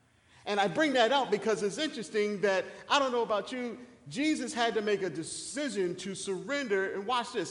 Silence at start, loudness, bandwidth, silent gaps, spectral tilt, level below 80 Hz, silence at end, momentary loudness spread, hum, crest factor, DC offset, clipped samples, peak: 0.45 s; -31 LUFS; 11 kHz; none; -3.5 dB/octave; -72 dBFS; 0 s; 10 LU; none; 20 dB; under 0.1%; under 0.1%; -10 dBFS